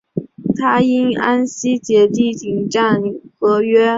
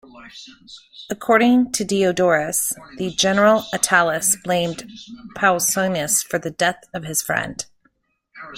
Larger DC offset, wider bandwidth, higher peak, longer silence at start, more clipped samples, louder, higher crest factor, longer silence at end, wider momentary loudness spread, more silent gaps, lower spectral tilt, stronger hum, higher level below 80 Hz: neither; second, 7.8 kHz vs 16.5 kHz; about the same, 0 dBFS vs -2 dBFS; about the same, 0.15 s vs 0.15 s; neither; first, -16 LUFS vs -19 LUFS; about the same, 14 dB vs 18 dB; about the same, 0 s vs 0 s; second, 9 LU vs 21 LU; neither; first, -5.5 dB/octave vs -3 dB/octave; neither; about the same, -56 dBFS vs -56 dBFS